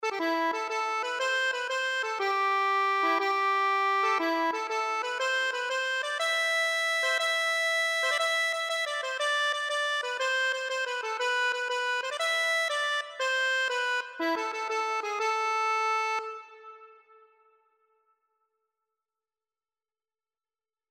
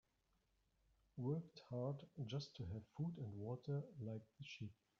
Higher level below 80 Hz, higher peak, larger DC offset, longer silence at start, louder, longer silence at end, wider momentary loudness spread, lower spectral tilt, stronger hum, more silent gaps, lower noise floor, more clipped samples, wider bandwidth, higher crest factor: second, -90 dBFS vs -78 dBFS; first, -16 dBFS vs -32 dBFS; neither; second, 0 s vs 1.15 s; first, -27 LUFS vs -50 LUFS; first, 4 s vs 0.25 s; second, 5 LU vs 8 LU; second, 1 dB/octave vs -7.5 dB/octave; neither; neither; first, under -90 dBFS vs -84 dBFS; neither; first, 16 kHz vs 7.2 kHz; about the same, 14 dB vs 16 dB